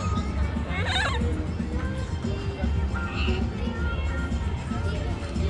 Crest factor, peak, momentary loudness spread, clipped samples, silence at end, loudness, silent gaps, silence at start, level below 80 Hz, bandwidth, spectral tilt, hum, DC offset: 14 dB; -12 dBFS; 5 LU; under 0.1%; 0 s; -28 LUFS; none; 0 s; -32 dBFS; 10.5 kHz; -6 dB/octave; none; under 0.1%